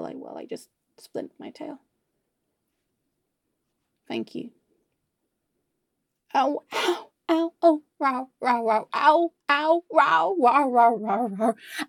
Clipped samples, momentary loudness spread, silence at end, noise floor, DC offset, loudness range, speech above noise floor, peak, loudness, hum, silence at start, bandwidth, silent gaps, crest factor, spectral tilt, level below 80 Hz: under 0.1%; 19 LU; 0.05 s; -79 dBFS; under 0.1%; 20 LU; 56 dB; -6 dBFS; -23 LUFS; none; 0 s; 16.5 kHz; none; 20 dB; -4.5 dB/octave; -86 dBFS